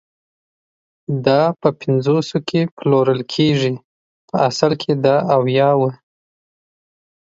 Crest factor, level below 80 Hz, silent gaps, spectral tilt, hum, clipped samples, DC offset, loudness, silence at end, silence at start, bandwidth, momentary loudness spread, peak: 18 dB; -60 dBFS; 2.71-2.77 s, 3.84-4.28 s; -6.5 dB/octave; none; under 0.1%; under 0.1%; -17 LUFS; 1.25 s; 1.1 s; 7.8 kHz; 8 LU; 0 dBFS